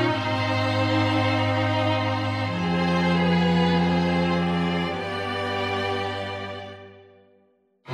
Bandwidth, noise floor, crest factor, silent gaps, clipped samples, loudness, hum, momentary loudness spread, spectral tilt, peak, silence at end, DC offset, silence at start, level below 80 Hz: 9.8 kHz; -63 dBFS; 14 dB; none; under 0.1%; -23 LUFS; none; 9 LU; -6.5 dB/octave; -10 dBFS; 0 s; under 0.1%; 0 s; -52 dBFS